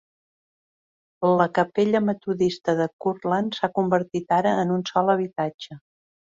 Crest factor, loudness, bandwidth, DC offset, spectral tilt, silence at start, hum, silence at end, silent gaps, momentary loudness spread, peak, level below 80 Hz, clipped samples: 18 dB; -23 LUFS; 7.8 kHz; under 0.1%; -6.5 dB/octave; 1.2 s; none; 0.55 s; 2.93-2.99 s, 5.54-5.59 s; 7 LU; -6 dBFS; -64 dBFS; under 0.1%